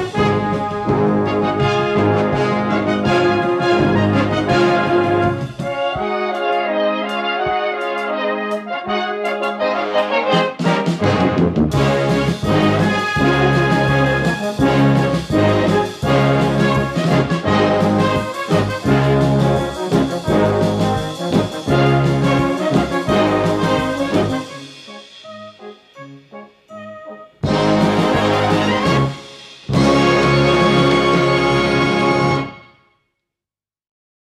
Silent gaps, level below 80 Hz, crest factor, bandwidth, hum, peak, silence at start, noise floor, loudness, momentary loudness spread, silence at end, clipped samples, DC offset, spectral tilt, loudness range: none; -38 dBFS; 16 dB; 13.5 kHz; none; -2 dBFS; 0 s; -90 dBFS; -16 LUFS; 8 LU; 1.75 s; under 0.1%; under 0.1%; -6.5 dB/octave; 5 LU